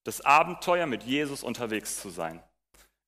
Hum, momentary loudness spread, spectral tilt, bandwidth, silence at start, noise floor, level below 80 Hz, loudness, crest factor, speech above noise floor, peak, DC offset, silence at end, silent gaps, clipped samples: none; 14 LU; -3.5 dB/octave; 15.5 kHz; 0.05 s; -63 dBFS; -64 dBFS; -27 LUFS; 22 dB; 35 dB; -8 dBFS; under 0.1%; 0.65 s; none; under 0.1%